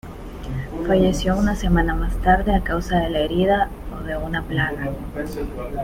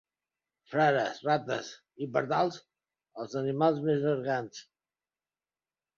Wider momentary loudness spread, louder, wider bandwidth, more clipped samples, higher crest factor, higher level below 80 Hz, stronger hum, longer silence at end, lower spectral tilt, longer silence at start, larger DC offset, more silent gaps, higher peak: second, 11 LU vs 18 LU; first, -22 LUFS vs -30 LUFS; first, 16 kHz vs 7.4 kHz; neither; about the same, 18 dB vs 20 dB; first, -28 dBFS vs -76 dBFS; neither; second, 0 s vs 1.35 s; about the same, -6.5 dB/octave vs -6 dB/octave; second, 0.05 s vs 0.7 s; neither; neither; first, -2 dBFS vs -12 dBFS